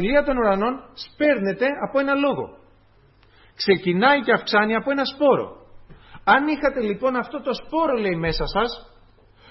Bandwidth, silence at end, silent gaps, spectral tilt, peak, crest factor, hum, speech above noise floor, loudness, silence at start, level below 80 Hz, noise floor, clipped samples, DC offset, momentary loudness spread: 6 kHz; 0.65 s; none; -7 dB/octave; -4 dBFS; 18 dB; none; 35 dB; -21 LUFS; 0 s; -42 dBFS; -55 dBFS; under 0.1%; under 0.1%; 9 LU